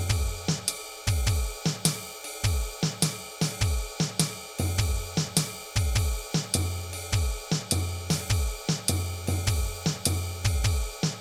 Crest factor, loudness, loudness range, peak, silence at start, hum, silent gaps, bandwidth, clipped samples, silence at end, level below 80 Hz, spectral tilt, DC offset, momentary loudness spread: 20 dB; -28 LUFS; 1 LU; -8 dBFS; 0 s; none; none; 17.5 kHz; under 0.1%; 0 s; -34 dBFS; -4 dB/octave; under 0.1%; 4 LU